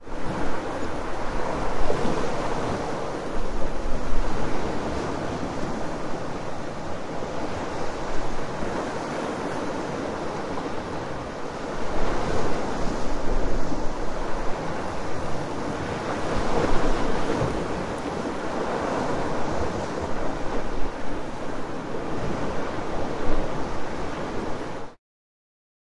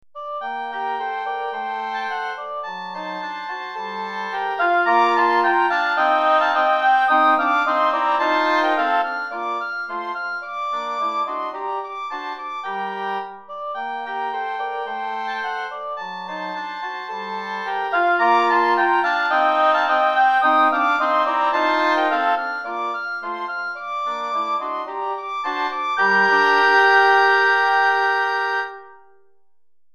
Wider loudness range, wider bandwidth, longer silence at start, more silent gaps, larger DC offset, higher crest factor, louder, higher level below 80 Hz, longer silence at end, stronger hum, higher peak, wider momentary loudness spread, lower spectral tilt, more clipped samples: second, 4 LU vs 11 LU; second, 11 kHz vs 13.5 kHz; second, 0 s vs 0.15 s; neither; neither; about the same, 16 dB vs 16 dB; second, -30 LUFS vs -20 LUFS; first, -32 dBFS vs -72 dBFS; about the same, 1 s vs 0.95 s; neither; about the same, -6 dBFS vs -4 dBFS; second, 6 LU vs 13 LU; first, -5.5 dB/octave vs -3.5 dB/octave; neither